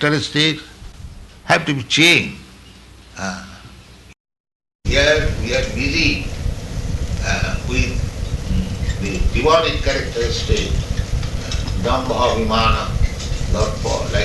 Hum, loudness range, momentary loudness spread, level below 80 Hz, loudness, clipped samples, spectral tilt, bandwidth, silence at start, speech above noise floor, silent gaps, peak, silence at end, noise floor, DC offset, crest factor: none; 3 LU; 14 LU; -24 dBFS; -18 LUFS; under 0.1%; -4.5 dB/octave; 12 kHz; 0 s; 25 dB; 4.20-4.25 s, 4.40-4.44 s, 4.55-4.60 s, 4.75-4.79 s; -2 dBFS; 0 s; -42 dBFS; under 0.1%; 18 dB